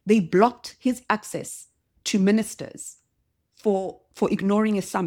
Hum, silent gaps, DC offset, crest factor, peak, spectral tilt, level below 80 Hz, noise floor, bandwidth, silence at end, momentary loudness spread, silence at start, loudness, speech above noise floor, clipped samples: none; none; under 0.1%; 22 dB; -4 dBFS; -5.5 dB/octave; -62 dBFS; -73 dBFS; 16 kHz; 0 s; 16 LU; 0.05 s; -24 LUFS; 50 dB; under 0.1%